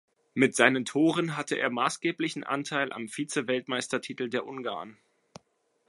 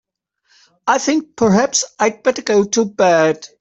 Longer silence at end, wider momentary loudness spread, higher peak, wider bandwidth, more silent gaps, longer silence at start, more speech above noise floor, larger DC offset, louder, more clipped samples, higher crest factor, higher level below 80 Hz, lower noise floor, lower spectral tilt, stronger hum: first, 0.95 s vs 0.15 s; first, 12 LU vs 6 LU; second, -6 dBFS vs -2 dBFS; first, 11.5 kHz vs 8.4 kHz; neither; second, 0.35 s vs 0.85 s; about the same, 44 dB vs 47 dB; neither; second, -28 LUFS vs -16 LUFS; neither; first, 24 dB vs 16 dB; second, -78 dBFS vs -56 dBFS; first, -73 dBFS vs -63 dBFS; about the same, -4 dB/octave vs -4 dB/octave; neither